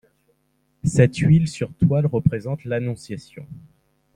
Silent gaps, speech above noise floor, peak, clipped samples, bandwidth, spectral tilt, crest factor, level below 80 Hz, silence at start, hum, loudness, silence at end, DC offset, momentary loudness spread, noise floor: none; 47 dB; -2 dBFS; under 0.1%; 10.5 kHz; -7.5 dB/octave; 20 dB; -48 dBFS; 0.85 s; none; -20 LUFS; 0.55 s; under 0.1%; 18 LU; -67 dBFS